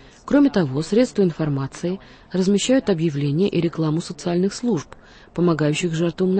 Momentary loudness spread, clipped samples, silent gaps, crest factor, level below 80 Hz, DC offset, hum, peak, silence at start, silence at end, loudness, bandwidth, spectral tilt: 9 LU; under 0.1%; none; 14 dB; -50 dBFS; under 0.1%; none; -6 dBFS; 0.25 s; 0 s; -21 LUFS; 8.8 kHz; -6.5 dB/octave